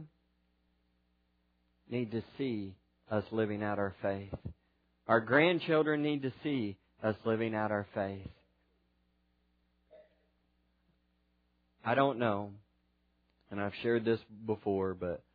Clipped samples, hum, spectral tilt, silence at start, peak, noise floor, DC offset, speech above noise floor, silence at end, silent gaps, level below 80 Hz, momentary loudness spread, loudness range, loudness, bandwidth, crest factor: under 0.1%; 60 Hz at -70 dBFS; -5 dB/octave; 0 s; -12 dBFS; -75 dBFS; under 0.1%; 42 dB; 0.15 s; none; -68 dBFS; 14 LU; 9 LU; -34 LUFS; 5 kHz; 24 dB